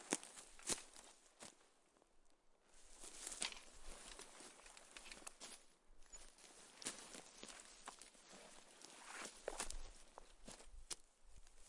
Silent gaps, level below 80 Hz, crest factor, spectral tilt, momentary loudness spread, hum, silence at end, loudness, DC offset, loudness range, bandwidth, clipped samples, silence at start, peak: none; -64 dBFS; 36 dB; -1 dB/octave; 15 LU; none; 0 s; -53 LUFS; under 0.1%; 4 LU; 11.5 kHz; under 0.1%; 0 s; -20 dBFS